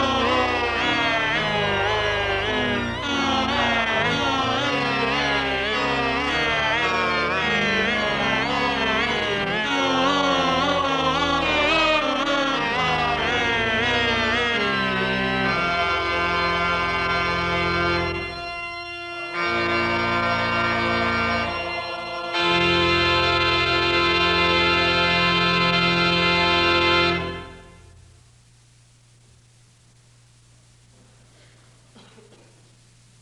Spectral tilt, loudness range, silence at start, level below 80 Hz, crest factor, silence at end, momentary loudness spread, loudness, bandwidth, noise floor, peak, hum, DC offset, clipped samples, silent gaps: -4.5 dB/octave; 5 LU; 0 s; -44 dBFS; 16 dB; 5.55 s; 6 LU; -20 LUFS; 11.5 kHz; -54 dBFS; -6 dBFS; none; under 0.1%; under 0.1%; none